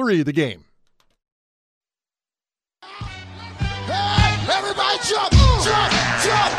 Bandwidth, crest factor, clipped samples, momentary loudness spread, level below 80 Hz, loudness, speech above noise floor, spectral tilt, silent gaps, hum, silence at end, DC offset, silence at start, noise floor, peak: 13 kHz; 18 dB; under 0.1%; 19 LU; -28 dBFS; -18 LUFS; over 70 dB; -4 dB/octave; 1.32-1.81 s; none; 0 s; under 0.1%; 0 s; under -90 dBFS; -4 dBFS